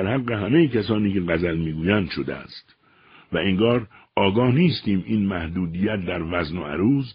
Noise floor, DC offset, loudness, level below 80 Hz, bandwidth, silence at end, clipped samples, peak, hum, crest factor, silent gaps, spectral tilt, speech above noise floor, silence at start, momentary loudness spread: -53 dBFS; under 0.1%; -22 LUFS; -46 dBFS; 5.4 kHz; 0 s; under 0.1%; -4 dBFS; none; 18 dB; none; -5.5 dB/octave; 31 dB; 0 s; 10 LU